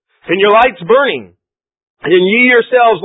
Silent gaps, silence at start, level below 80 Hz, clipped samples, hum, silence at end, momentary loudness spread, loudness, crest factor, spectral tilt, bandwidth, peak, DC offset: 1.83-1.97 s; 0.3 s; -50 dBFS; under 0.1%; none; 0 s; 10 LU; -10 LUFS; 12 dB; -7.5 dB/octave; 4 kHz; 0 dBFS; under 0.1%